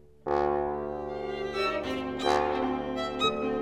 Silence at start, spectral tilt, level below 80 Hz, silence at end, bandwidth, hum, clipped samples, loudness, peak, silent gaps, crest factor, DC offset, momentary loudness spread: 0.25 s; -5 dB/octave; -50 dBFS; 0 s; 12.5 kHz; none; under 0.1%; -30 LUFS; -12 dBFS; none; 18 dB; 0.1%; 7 LU